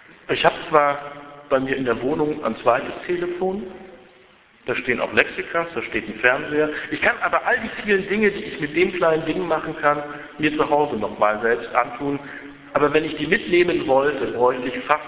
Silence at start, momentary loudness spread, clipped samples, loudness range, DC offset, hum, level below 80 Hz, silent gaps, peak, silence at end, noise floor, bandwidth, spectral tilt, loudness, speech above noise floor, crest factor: 0.3 s; 9 LU; under 0.1%; 3 LU; under 0.1%; none; -52 dBFS; none; 0 dBFS; 0 s; -52 dBFS; 4 kHz; -9 dB/octave; -21 LUFS; 31 dB; 22 dB